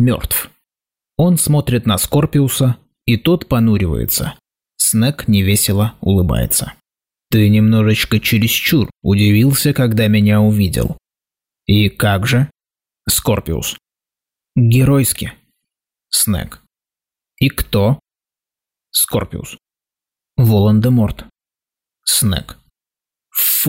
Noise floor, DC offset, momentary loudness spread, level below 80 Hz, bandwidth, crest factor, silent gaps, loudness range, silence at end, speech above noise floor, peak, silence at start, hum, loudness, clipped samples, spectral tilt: under -90 dBFS; under 0.1%; 11 LU; -36 dBFS; 16.5 kHz; 12 dB; none; 6 LU; 0 s; over 76 dB; -4 dBFS; 0 s; none; -15 LUFS; under 0.1%; -5 dB/octave